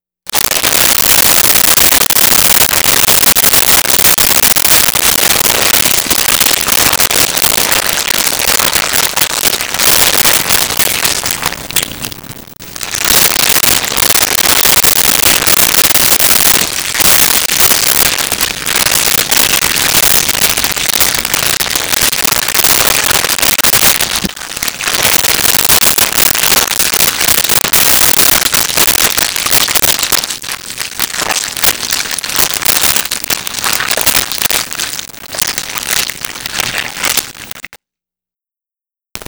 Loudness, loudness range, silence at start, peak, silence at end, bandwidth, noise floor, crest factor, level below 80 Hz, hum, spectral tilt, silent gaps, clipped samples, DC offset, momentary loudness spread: -8 LUFS; 6 LU; 0.25 s; 0 dBFS; 0.05 s; over 20 kHz; -89 dBFS; 10 dB; -36 dBFS; none; 0 dB/octave; none; under 0.1%; 0.1%; 9 LU